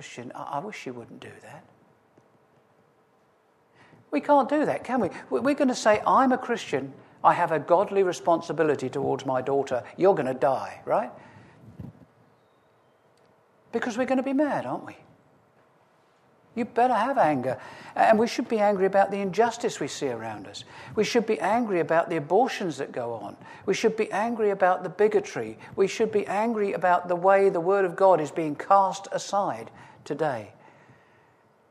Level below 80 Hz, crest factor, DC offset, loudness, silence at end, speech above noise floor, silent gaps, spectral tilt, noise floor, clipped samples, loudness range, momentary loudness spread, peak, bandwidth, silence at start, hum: -70 dBFS; 20 dB; under 0.1%; -25 LUFS; 1.2 s; 39 dB; none; -5.5 dB/octave; -63 dBFS; under 0.1%; 7 LU; 15 LU; -6 dBFS; 13.5 kHz; 0 s; none